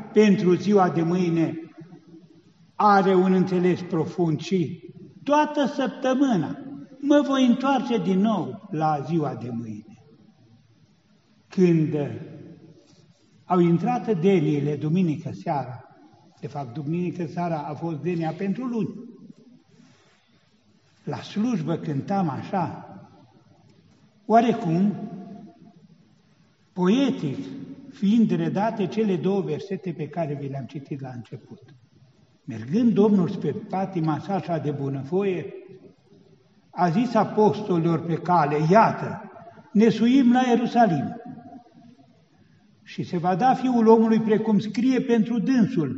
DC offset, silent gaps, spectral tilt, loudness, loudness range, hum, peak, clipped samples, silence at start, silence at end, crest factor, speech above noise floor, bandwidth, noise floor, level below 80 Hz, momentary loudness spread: under 0.1%; none; -7 dB/octave; -23 LUFS; 8 LU; none; -4 dBFS; under 0.1%; 0 s; 0 s; 20 dB; 40 dB; 7.6 kHz; -62 dBFS; -70 dBFS; 19 LU